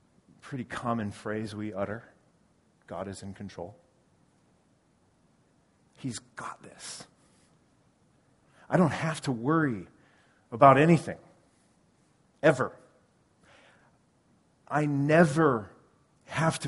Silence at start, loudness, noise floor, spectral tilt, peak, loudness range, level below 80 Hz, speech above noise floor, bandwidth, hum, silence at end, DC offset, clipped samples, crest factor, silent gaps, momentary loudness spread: 0.45 s; -27 LUFS; -67 dBFS; -6.5 dB/octave; -4 dBFS; 20 LU; -66 dBFS; 40 dB; 11.5 kHz; none; 0 s; under 0.1%; under 0.1%; 26 dB; none; 21 LU